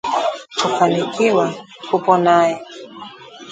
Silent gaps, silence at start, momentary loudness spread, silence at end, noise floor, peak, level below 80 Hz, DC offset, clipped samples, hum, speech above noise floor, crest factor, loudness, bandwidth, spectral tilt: none; 0.05 s; 21 LU; 0 s; -37 dBFS; 0 dBFS; -66 dBFS; under 0.1%; under 0.1%; none; 20 dB; 18 dB; -17 LUFS; 9.4 kHz; -5 dB/octave